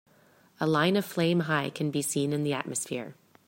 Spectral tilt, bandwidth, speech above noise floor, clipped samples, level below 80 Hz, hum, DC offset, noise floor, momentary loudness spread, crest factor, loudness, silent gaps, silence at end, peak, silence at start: -4.5 dB/octave; 16.5 kHz; 33 dB; under 0.1%; -70 dBFS; none; under 0.1%; -61 dBFS; 8 LU; 20 dB; -28 LUFS; none; 0.35 s; -10 dBFS; 0.6 s